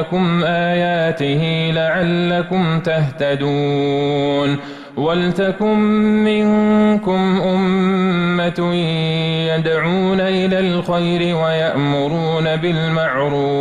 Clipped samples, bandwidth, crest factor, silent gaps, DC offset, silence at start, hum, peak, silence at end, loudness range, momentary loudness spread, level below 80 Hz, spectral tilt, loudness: under 0.1%; 10 kHz; 8 dB; none; under 0.1%; 0 s; none; -8 dBFS; 0 s; 2 LU; 3 LU; -48 dBFS; -7.5 dB/octave; -16 LUFS